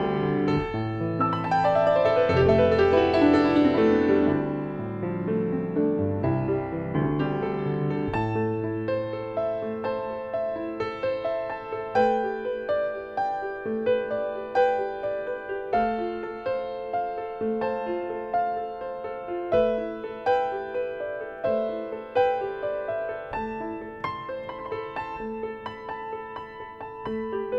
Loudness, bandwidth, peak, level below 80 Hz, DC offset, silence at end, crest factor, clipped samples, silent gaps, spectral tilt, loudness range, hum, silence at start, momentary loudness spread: -26 LUFS; 8 kHz; -8 dBFS; -52 dBFS; under 0.1%; 0 s; 18 dB; under 0.1%; none; -8.5 dB/octave; 9 LU; none; 0 s; 13 LU